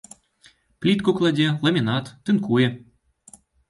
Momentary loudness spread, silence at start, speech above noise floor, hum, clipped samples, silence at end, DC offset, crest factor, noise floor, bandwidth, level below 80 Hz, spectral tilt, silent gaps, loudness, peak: 6 LU; 0.8 s; 36 dB; none; under 0.1%; 0.9 s; under 0.1%; 16 dB; -57 dBFS; 11.5 kHz; -60 dBFS; -6.5 dB/octave; none; -21 LUFS; -6 dBFS